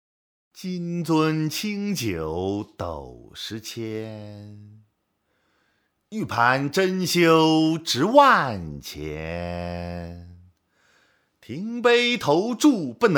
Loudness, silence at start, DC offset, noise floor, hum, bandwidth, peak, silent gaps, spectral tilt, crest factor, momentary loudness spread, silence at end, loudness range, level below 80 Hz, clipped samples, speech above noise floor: -22 LUFS; 0.55 s; under 0.1%; -72 dBFS; none; 20 kHz; -2 dBFS; none; -5 dB/octave; 22 dB; 19 LU; 0 s; 15 LU; -52 dBFS; under 0.1%; 50 dB